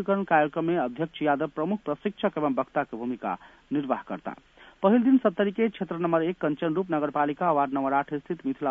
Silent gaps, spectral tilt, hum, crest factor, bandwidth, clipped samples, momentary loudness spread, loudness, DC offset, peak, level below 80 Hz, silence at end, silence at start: none; -9 dB/octave; none; 18 dB; 3.8 kHz; under 0.1%; 10 LU; -27 LUFS; under 0.1%; -8 dBFS; -66 dBFS; 0 s; 0 s